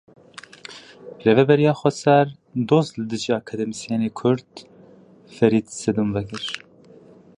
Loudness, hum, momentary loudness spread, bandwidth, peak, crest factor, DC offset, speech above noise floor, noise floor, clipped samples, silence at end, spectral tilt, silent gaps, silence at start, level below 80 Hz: -21 LUFS; none; 22 LU; 11 kHz; -2 dBFS; 20 dB; under 0.1%; 29 dB; -49 dBFS; under 0.1%; 0.8 s; -6 dB/octave; none; 0.7 s; -58 dBFS